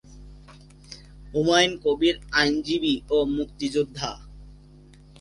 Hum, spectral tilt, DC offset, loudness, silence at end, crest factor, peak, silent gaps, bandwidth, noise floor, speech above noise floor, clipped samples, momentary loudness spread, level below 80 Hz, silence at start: 50 Hz at -45 dBFS; -4 dB/octave; under 0.1%; -23 LUFS; 0.7 s; 20 dB; -6 dBFS; none; 11.5 kHz; -49 dBFS; 26 dB; under 0.1%; 24 LU; -46 dBFS; 0.1 s